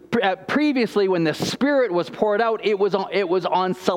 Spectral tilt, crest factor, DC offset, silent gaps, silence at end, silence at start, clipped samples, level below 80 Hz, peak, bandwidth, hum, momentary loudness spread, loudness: -5.5 dB/octave; 18 dB; under 0.1%; none; 0 s; 0.1 s; under 0.1%; -62 dBFS; -2 dBFS; 16.5 kHz; none; 3 LU; -21 LUFS